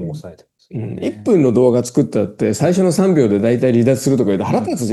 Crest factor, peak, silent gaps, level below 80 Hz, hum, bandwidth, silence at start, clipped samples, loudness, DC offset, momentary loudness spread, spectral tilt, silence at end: 14 dB; 0 dBFS; none; -56 dBFS; none; 12.5 kHz; 0 s; under 0.1%; -15 LUFS; under 0.1%; 12 LU; -7 dB/octave; 0 s